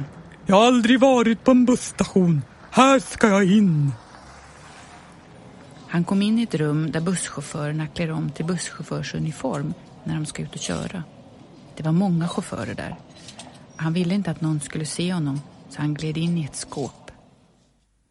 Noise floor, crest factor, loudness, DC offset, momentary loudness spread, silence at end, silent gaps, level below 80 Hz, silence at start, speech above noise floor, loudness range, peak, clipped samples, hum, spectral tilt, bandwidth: -63 dBFS; 22 dB; -22 LUFS; under 0.1%; 17 LU; 1 s; none; -54 dBFS; 0 s; 42 dB; 10 LU; 0 dBFS; under 0.1%; none; -6 dB/octave; 11.5 kHz